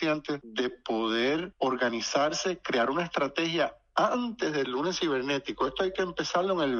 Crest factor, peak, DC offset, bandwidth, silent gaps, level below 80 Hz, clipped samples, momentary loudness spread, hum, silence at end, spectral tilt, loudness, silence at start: 18 dB; -12 dBFS; under 0.1%; 7.6 kHz; none; -62 dBFS; under 0.1%; 4 LU; none; 0 s; -4 dB/octave; -29 LUFS; 0 s